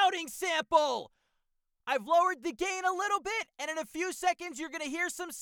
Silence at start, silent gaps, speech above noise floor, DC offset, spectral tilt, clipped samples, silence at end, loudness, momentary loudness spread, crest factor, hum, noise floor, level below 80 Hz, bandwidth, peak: 0 s; none; 48 dB; under 0.1%; -1 dB/octave; under 0.1%; 0 s; -31 LUFS; 9 LU; 20 dB; none; -79 dBFS; -70 dBFS; over 20 kHz; -12 dBFS